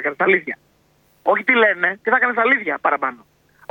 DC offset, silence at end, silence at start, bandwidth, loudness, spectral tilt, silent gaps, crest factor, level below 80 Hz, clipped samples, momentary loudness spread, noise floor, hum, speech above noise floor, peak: under 0.1%; 0.55 s; 0 s; 17 kHz; -17 LUFS; -6 dB/octave; none; 18 dB; -68 dBFS; under 0.1%; 11 LU; -59 dBFS; none; 41 dB; -2 dBFS